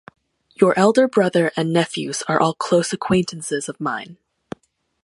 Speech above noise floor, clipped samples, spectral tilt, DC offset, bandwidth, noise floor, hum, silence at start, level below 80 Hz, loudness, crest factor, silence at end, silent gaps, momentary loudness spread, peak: 20 dB; under 0.1%; -5 dB/octave; under 0.1%; 11.5 kHz; -39 dBFS; none; 0.6 s; -58 dBFS; -19 LUFS; 20 dB; 0.9 s; none; 22 LU; 0 dBFS